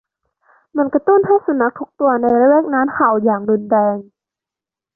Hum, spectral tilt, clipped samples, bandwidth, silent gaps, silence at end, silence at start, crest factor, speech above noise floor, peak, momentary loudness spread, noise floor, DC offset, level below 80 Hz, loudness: none; -12 dB/octave; under 0.1%; 2.2 kHz; none; 0.95 s; 0.75 s; 14 dB; 73 dB; -2 dBFS; 7 LU; -88 dBFS; under 0.1%; -60 dBFS; -15 LUFS